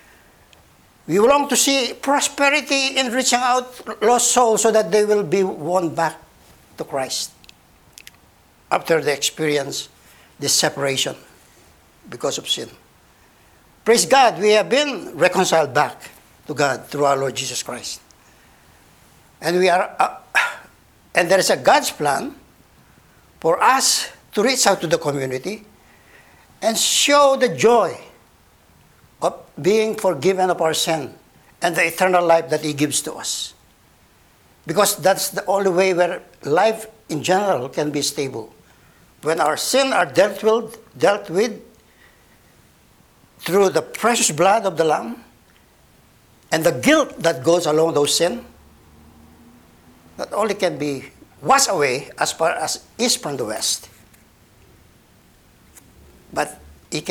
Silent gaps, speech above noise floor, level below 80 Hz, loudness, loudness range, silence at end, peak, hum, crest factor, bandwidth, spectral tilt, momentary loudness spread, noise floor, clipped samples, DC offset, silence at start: none; 35 dB; -58 dBFS; -18 LUFS; 6 LU; 0 s; 0 dBFS; none; 20 dB; over 20 kHz; -2.5 dB/octave; 13 LU; -54 dBFS; under 0.1%; under 0.1%; 1.1 s